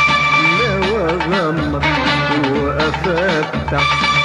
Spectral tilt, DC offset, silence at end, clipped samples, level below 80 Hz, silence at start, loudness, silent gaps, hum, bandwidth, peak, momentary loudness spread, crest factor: -5 dB/octave; under 0.1%; 0 s; under 0.1%; -32 dBFS; 0 s; -15 LUFS; none; none; 11 kHz; -4 dBFS; 5 LU; 12 dB